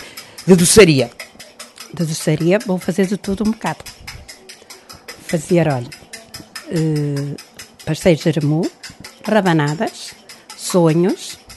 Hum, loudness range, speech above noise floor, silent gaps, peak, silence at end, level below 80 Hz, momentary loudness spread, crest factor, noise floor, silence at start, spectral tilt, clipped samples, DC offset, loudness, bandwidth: none; 7 LU; 25 dB; none; 0 dBFS; 0 s; -46 dBFS; 22 LU; 18 dB; -40 dBFS; 0 s; -5 dB/octave; under 0.1%; under 0.1%; -16 LUFS; 12.5 kHz